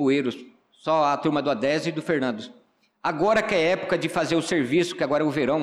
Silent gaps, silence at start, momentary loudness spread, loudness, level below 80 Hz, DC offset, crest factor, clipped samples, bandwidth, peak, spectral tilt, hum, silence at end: none; 0 s; 9 LU; -24 LUFS; -62 dBFS; under 0.1%; 12 dB; under 0.1%; 13.5 kHz; -12 dBFS; -5.5 dB/octave; none; 0 s